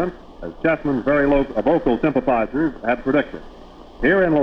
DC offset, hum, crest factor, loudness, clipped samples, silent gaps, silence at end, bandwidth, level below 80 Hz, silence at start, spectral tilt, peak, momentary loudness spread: under 0.1%; none; 14 dB; -19 LUFS; under 0.1%; none; 0 s; 6.2 kHz; -38 dBFS; 0 s; -8.5 dB/octave; -4 dBFS; 11 LU